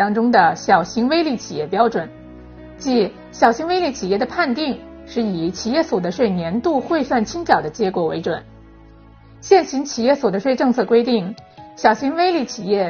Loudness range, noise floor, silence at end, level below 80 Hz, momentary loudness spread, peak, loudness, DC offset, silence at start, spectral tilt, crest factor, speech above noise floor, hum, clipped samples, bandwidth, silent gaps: 2 LU; -44 dBFS; 0 s; -50 dBFS; 9 LU; 0 dBFS; -18 LUFS; under 0.1%; 0 s; -4 dB/octave; 18 dB; 26 dB; none; under 0.1%; 6.8 kHz; none